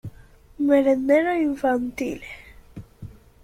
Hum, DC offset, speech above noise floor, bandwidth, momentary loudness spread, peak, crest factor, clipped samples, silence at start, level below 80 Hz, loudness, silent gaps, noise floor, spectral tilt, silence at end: none; under 0.1%; 28 dB; 15 kHz; 23 LU; -6 dBFS; 16 dB; under 0.1%; 0.05 s; -52 dBFS; -21 LUFS; none; -49 dBFS; -6.5 dB/octave; 0.3 s